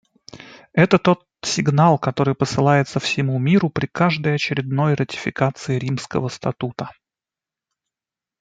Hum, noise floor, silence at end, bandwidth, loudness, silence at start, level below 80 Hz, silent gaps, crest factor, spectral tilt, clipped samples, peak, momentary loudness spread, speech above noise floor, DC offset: none; -89 dBFS; 1.5 s; 9.2 kHz; -20 LUFS; 0.35 s; -56 dBFS; none; 18 dB; -6 dB/octave; under 0.1%; -2 dBFS; 10 LU; 70 dB; under 0.1%